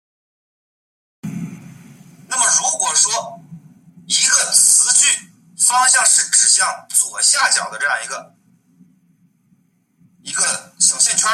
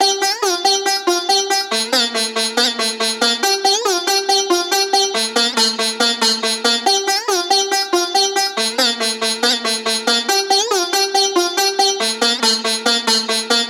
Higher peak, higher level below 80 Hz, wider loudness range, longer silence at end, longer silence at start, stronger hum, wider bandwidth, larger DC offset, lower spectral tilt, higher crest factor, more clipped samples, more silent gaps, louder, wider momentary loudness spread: about the same, 0 dBFS vs -2 dBFS; first, -70 dBFS vs -88 dBFS; first, 8 LU vs 1 LU; about the same, 0 s vs 0 s; first, 1.25 s vs 0 s; neither; second, 16.5 kHz vs over 20 kHz; neither; about the same, 1 dB/octave vs 0.5 dB/octave; about the same, 18 dB vs 16 dB; neither; neither; about the same, -13 LUFS vs -15 LUFS; first, 19 LU vs 3 LU